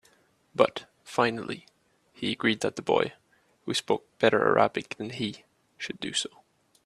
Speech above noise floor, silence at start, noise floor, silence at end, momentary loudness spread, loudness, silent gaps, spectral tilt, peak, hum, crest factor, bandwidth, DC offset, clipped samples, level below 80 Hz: 37 dB; 0.55 s; -64 dBFS; 0.6 s; 15 LU; -28 LUFS; none; -4 dB/octave; -4 dBFS; none; 26 dB; 13 kHz; under 0.1%; under 0.1%; -68 dBFS